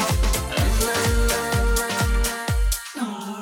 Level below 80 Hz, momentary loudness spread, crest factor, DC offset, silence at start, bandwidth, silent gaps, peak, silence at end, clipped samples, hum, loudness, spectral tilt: -24 dBFS; 6 LU; 14 dB; under 0.1%; 0 s; 18.5 kHz; none; -8 dBFS; 0 s; under 0.1%; none; -23 LUFS; -4 dB/octave